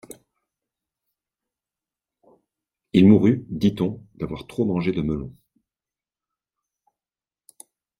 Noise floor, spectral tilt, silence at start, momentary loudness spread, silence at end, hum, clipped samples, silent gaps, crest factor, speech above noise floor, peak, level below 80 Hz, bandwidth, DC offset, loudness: under -90 dBFS; -8 dB/octave; 2.95 s; 17 LU; 2.7 s; none; under 0.1%; none; 22 dB; over 70 dB; -2 dBFS; -52 dBFS; 11.5 kHz; under 0.1%; -21 LUFS